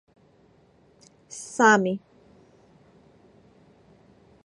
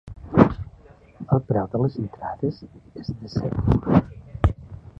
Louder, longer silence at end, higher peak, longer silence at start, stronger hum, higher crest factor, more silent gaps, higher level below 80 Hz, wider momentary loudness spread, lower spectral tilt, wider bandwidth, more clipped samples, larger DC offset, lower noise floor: about the same, -22 LUFS vs -23 LUFS; first, 2.45 s vs 0.25 s; second, -4 dBFS vs 0 dBFS; first, 1.3 s vs 0.05 s; neither; about the same, 26 dB vs 24 dB; neither; second, -70 dBFS vs -36 dBFS; about the same, 22 LU vs 21 LU; second, -4.5 dB/octave vs -10 dB/octave; first, 11.5 kHz vs 6.2 kHz; neither; neither; first, -59 dBFS vs -49 dBFS